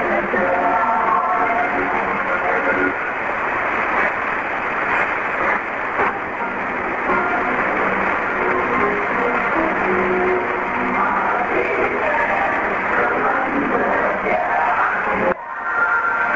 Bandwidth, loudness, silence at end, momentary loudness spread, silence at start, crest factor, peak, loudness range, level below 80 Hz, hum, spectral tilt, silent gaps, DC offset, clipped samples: 7.8 kHz; -18 LUFS; 0 s; 4 LU; 0 s; 16 dB; -4 dBFS; 1 LU; -46 dBFS; none; -6 dB/octave; none; under 0.1%; under 0.1%